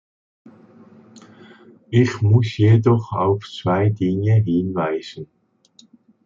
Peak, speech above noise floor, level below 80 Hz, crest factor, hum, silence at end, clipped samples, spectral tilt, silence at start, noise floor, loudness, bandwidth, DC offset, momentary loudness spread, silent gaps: -4 dBFS; 37 dB; -58 dBFS; 16 dB; none; 1 s; under 0.1%; -8.5 dB/octave; 1.9 s; -54 dBFS; -19 LUFS; 7.4 kHz; under 0.1%; 10 LU; none